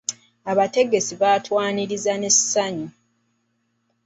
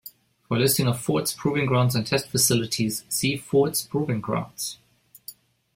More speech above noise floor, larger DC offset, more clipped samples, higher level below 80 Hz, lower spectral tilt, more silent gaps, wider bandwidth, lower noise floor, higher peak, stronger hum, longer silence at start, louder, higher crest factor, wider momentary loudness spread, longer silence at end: first, 50 dB vs 23 dB; neither; neither; second, -66 dBFS vs -56 dBFS; second, -2.5 dB/octave vs -4.5 dB/octave; neither; second, 8.2 kHz vs 16.5 kHz; first, -70 dBFS vs -47 dBFS; about the same, -4 dBFS vs -6 dBFS; neither; about the same, 0.1 s vs 0.05 s; first, -20 LUFS vs -24 LUFS; about the same, 18 dB vs 18 dB; about the same, 14 LU vs 13 LU; first, 1.15 s vs 0.45 s